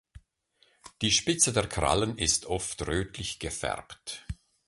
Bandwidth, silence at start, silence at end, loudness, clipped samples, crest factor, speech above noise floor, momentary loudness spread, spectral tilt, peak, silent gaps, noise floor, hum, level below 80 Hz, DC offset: 12 kHz; 0.15 s; 0.35 s; -28 LUFS; under 0.1%; 24 dB; 39 dB; 16 LU; -2.5 dB/octave; -8 dBFS; none; -68 dBFS; none; -46 dBFS; under 0.1%